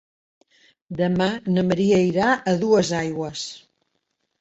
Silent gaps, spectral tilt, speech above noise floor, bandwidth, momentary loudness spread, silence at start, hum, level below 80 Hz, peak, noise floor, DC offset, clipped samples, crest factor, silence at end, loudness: none; -6 dB/octave; 54 dB; 8.2 kHz; 12 LU; 0.9 s; none; -56 dBFS; -6 dBFS; -74 dBFS; under 0.1%; under 0.1%; 16 dB; 0.8 s; -21 LUFS